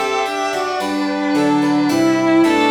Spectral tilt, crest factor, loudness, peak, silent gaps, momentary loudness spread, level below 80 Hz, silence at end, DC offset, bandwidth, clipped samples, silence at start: -4.5 dB/octave; 12 dB; -16 LUFS; -2 dBFS; none; 6 LU; -58 dBFS; 0 s; under 0.1%; 16.5 kHz; under 0.1%; 0 s